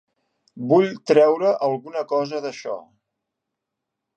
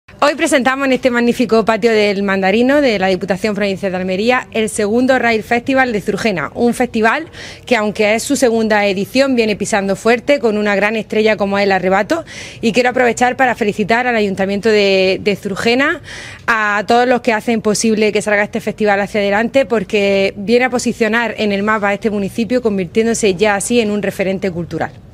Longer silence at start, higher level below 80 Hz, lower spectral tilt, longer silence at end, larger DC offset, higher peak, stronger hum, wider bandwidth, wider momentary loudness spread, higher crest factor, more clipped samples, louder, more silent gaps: first, 0.55 s vs 0.15 s; second, -78 dBFS vs -46 dBFS; first, -6.5 dB/octave vs -4.5 dB/octave; first, 1.35 s vs 0.1 s; neither; about the same, -2 dBFS vs 0 dBFS; neither; second, 8.8 kHz vs 16 kHz; first, 16 LU vs 5 LU; first, 20 dB vs 14 dB; neither; second, -20 LUFS vs -14 LUFS; neither